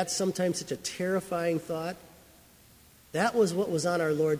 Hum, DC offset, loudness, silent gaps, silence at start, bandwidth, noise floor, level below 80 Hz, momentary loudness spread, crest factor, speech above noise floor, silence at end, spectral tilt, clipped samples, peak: none; under 0.1%; -29 LUFS; none; 0 s; 16 kHz; -57 dBFS; -66 dBFS; 9 LU; 18 dB; 28 dB; 0 s; -4.5 dB/octave; under 0.1%; -12 dBFS